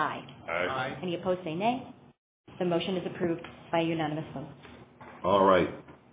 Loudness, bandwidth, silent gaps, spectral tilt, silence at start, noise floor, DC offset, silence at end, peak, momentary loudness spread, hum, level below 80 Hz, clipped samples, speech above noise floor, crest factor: -30 LUFS; 4 kHz; 2.18-2.44 s; -4.5 dB/octave; 0 s; -50 dBFS; under 0.1%; 0.2 s; -10 dBFS; 21 LU; none; -60 dBFS; under 0.1%; 20 dB; 22 dB